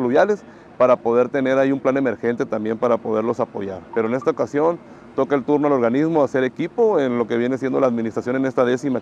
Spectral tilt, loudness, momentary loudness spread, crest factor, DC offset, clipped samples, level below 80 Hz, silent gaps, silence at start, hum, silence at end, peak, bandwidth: -7 dB/octave; -20 LUFS; 6 LU; 16 dB; under 0.1%; under 0.1%; -62 dBFS; none; 0 s; none; 0 s; -4 dBFS; 8.2 kHz